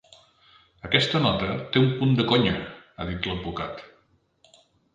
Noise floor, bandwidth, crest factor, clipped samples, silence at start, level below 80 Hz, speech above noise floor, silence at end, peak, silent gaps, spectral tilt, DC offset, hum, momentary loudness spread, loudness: -64 dBFS; 9.2 kHz; 24 dB; under 0.1%; 0.85 s; -48 dBFS; 40 dB; 1.1 s; -2 dBFS; none; -6.5 dB/octave; under 0.1%; none; 15 LU; -24 LUFS